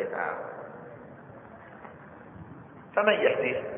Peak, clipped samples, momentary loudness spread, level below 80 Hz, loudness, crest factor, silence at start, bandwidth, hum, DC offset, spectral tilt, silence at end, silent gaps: -8 dBFS; under 0.1%; 23 LU; -68 dBFS; -27 LUFS; 24 dB; 0 s; 3.7 kHz; none; under 0.1%; -8.5 dB/octave; 0 s; none